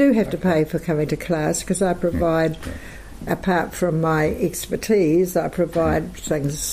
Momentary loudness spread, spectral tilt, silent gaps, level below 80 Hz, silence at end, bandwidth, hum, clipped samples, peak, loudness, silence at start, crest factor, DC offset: 8 LU; -5.5 dB/octave; none; -40 dBFS; 0 s; 15.5 kHz; none; under 0.1%; -8 dBFS; -21 LUFS; 0 s; 14 dB; under 0.1%